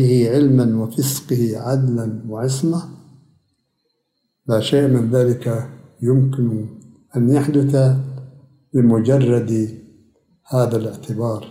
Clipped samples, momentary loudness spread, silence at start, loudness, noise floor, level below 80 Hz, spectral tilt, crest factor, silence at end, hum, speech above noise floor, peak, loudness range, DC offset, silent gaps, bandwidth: under 0.1%; 12 LU; 0 s; -18 LUFS; -72 dBFS; -60 dBFS; -7.5 dB/octave; 14 dB; 0 s; none; 55 dB; -4 dBFS; 5 LU; under 0.1%; none; 16 kHz